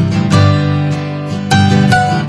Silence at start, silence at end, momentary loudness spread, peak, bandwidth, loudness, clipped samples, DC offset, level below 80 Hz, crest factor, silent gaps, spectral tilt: 0 s; 0 s; 9 LU; -2 dBFS; 12 kHz; -12 LUFS; under 0.1%; under 0.1%; -40 dBFS; 10 dB; none; -6 dB/octave